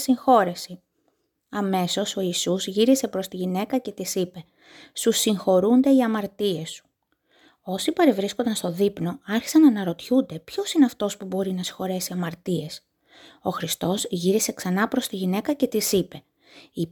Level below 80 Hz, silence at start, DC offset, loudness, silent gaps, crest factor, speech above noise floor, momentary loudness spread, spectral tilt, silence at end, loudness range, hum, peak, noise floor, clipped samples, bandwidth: -64 dBFS; 0 s; under 0.1%; -23 LUFS; none; 20 dB; 48 dB; 13 LU; -4.5 dB/octave; 0.05 s; 4 LU; none; -4 dBFS; -71 dBFS; under 0.1%; 19.5 kHz